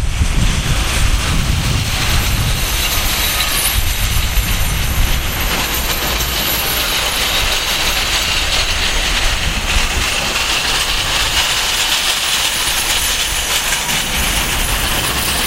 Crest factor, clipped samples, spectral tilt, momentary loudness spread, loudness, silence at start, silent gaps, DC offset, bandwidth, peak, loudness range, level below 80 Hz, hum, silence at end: 16 dB; under 0.1%; -2 dB/octave; 3 LU; -14 LUFS; 0 s; none; under 0.1%; 16 kHz; 0 dBFS; 2 LU; -20 dBFS; none; 0 s